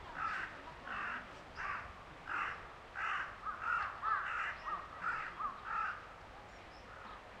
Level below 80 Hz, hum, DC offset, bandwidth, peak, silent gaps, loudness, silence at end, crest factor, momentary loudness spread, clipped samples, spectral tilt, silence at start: -64 dBFS; none; under 0.1%; 12 kHz; -24 dBFS; none; -41 LUFS; 0 s; 18 dB; 15 LU; under 0.1%; -3.5 dB/octave; 0 s